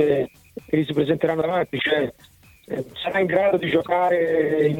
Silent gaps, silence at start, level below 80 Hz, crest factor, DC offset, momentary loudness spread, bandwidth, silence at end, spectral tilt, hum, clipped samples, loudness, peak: none; 0 s; -56 dBFS; 16 dB; under 0.1%; 11 LU; 17 kHz; 0 s; -7 dB/octave; none; under 0.1%; -22 LUFS; -6 dBFS